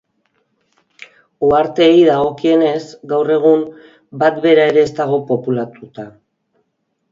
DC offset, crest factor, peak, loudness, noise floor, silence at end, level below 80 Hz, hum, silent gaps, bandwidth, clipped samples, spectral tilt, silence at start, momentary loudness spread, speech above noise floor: under 0.1%; 16 dB; 0 dBFS; -14 LUFS; -69 dBFS; 1.05 s; -54 dBFS; none; none; 7.6 kHz; under 0.1%; -6.5 dB/octave; 1.4 s; 19 LU; 55 dB